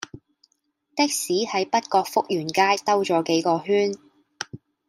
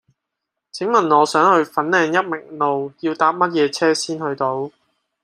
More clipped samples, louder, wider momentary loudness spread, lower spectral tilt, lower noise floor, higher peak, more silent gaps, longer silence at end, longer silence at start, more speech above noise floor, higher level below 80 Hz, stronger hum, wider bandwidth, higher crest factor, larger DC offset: neither; second, -22 LUFS vs -18 LUFS; first, 15 LU vs 12 LU; about the same, -3.5 dB/octave vs -4 dB/octave; second, -70 dBFS vs -80 dBFS; second, -6 dBFS vs -2 dBFS; neither; second, 0.3 s vs 0.55 s; second, 0 s vs 0.75 s; second, 48 dB vs 63 dB; about the same, -70 dBFS vs -70 dBFS; neither; first, 16 kHz vs 14.5 kHz; about the same, 18 dB vs 18 dB; neither